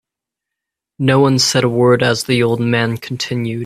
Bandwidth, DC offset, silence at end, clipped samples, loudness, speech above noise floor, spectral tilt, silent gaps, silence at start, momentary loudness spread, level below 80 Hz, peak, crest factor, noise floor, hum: 14.5 kHz; under 0.1%; 0 s; under 0.1%; -15 LUFS; 69 dB; -5 dB/octave; none; 1 s; 8 LU; -52 dBFS; 0 dBFS; 16 dB; -83 dBFS; none